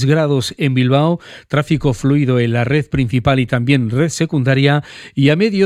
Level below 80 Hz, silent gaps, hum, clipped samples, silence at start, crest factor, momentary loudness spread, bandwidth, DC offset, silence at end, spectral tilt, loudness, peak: -40 dBFS; none; none; under 0.1%; 0 s; 14 dB; 5 LU; 12.5 kHz; under 0.1%; 0 s; -6.5 dB/octave; -15 LUFS; 0 dBFS